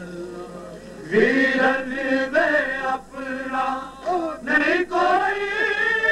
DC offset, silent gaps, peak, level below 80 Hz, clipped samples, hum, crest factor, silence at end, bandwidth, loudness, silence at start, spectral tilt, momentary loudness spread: under 0.1%; none; -4 dBFS; -54 dBFS; under 0.1%; none; 18 dB; 0 s; 12.5 kHz; -21 LUFS; 0 s; -4.5 dB/octave; 16 LU